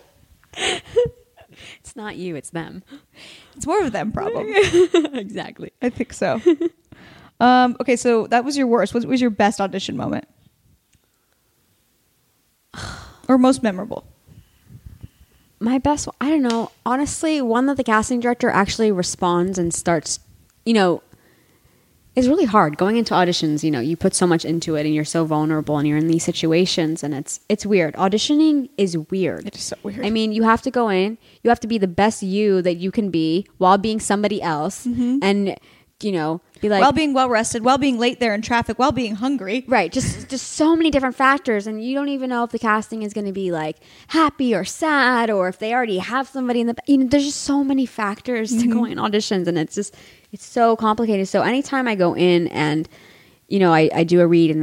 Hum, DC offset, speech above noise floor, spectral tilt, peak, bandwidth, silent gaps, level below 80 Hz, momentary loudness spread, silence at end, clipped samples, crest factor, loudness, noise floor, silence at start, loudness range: none; under 0.1%; 45 dB; -5 dB/octave; -2 dBFS; 16 kHz; none; -50 dBFS; 11 LU; 0 s; under 0.1%; 18 dB; -19 LUFS; -64 dBFS; 0.55 s; 5 LU